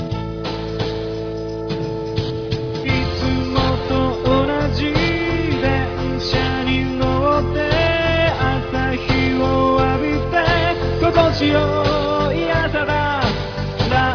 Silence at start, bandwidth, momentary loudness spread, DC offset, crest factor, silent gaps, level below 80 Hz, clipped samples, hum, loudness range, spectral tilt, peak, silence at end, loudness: 0 s; 5.4 kHz; 8 LU; under 0.1%; 16 dB; none; -30 dBFS; under 0.1%; none; 4 LU; -6.5 dB/octave; -2 dBFS; 0 s; -19 LUFS